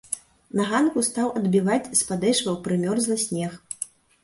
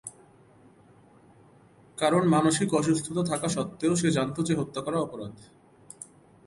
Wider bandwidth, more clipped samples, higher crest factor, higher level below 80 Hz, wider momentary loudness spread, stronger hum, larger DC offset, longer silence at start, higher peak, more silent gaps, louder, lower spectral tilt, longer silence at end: about the same, 12 kHz vs 11.5 kHz; neither; about the same, 18 dB vs 18 dB; about the same, -62 dBFS vs -62 dBFS; second, 12 LU vs 22 LU; neither; neither; about the same, 0.1 s vs 0.05 s; first, -6 dBFS vs -10 dBFS; neither; about the same, -24 LUFS vs -26 LUFS; about the same, -4 dB/octave vs -5 dB/octave; about the same, 0.35 s vs 0.4 s